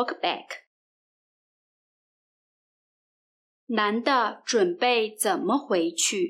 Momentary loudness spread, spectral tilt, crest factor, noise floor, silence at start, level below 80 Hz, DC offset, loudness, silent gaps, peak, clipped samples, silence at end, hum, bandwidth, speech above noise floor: 7 LU; -2 dB/octave; 18 dB; under -90 dBFS; 0 s; -88 dBFS; under 0.1%; -25 LUFS; 0.67-3.67 s; -8 dBFS; under 0.1%; 0 s; none; 16 kHz; over 65 dB